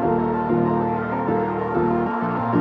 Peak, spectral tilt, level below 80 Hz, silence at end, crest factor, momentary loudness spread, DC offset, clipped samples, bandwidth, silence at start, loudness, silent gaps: -6 dBFS; -10.5 dB/octave; -48 dBFS; 0 s; 14 dB; 3 LU; under 0.1%; under 0.1%; 5.2 kHz; 0 s; -22 LUFS; none